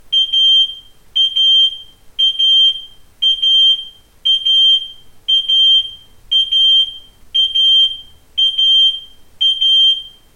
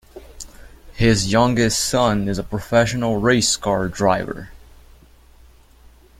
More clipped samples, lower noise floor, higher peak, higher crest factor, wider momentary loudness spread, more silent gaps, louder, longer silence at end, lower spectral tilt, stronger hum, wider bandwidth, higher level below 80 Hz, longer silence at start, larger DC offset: neither; second, -33 dBFS vs -48 dBFS; second, -6 dBFS vs -2 dBFS; second, 8 dB vs 18 dB; second, 11 LU vs 18 LU; neither; first, -10 LUFS vs -18 LUFS; second, 0.3 s vs 1.65 s; second, 2 dB/octave vs -4.5 dB/octave; neither; second, 13.5 kHz vs 16 kHz; second, -50 dBFS vs -40 dBFS; about the same, 0.1 s vs 0.15 s; neither